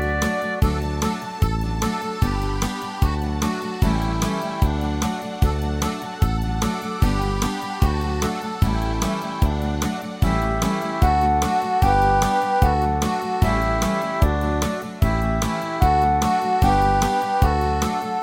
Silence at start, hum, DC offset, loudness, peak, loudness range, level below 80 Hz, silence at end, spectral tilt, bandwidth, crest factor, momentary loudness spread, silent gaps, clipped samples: 0 s; none; under 0.1%; -22 LUFS; -4 dBFS; 4 LU; -26 dBFS; 0 s; -5.5 dB/octave; 17.5 kHz; 16 dB; 6 LU; none; under 0.1%